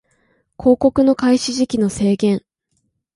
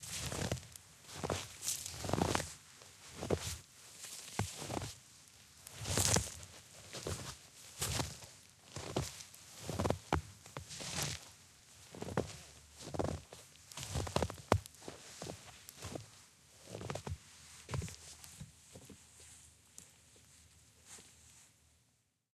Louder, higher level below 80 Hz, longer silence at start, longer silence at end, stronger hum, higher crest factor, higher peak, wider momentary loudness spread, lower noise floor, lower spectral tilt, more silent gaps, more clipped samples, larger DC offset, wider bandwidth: first, -17 LUFS vs -41 LUFS; first, -46 dBFS vs -56 dBFS; first, 0.6 s vs 0 s; second, 0.75 s vs 0.9 s; neither; second, 16 dB vs 34 dB; first, -2 dBFS vs -8 dBFS; second, 5 LU vs 21 LU; second, -69 dBFS vs -77 dBFS; first, -5.5 dB/octave vs -3.5 dB/octave; neither; neither; neither; second, 11.5 kHz vs 15.5 kHz